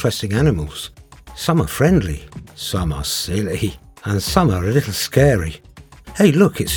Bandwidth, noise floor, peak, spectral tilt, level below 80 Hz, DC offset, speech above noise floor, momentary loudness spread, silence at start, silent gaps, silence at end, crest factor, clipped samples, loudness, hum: over 20 kHz; -39 dBFS; 0 dBFS; -5.5 dB/octave; -34 dBFS; under 0.1%; 22 dB; 16 LU; 0 s; none; 0 s; 18 dB; under 0.1%; -18 LUFS; none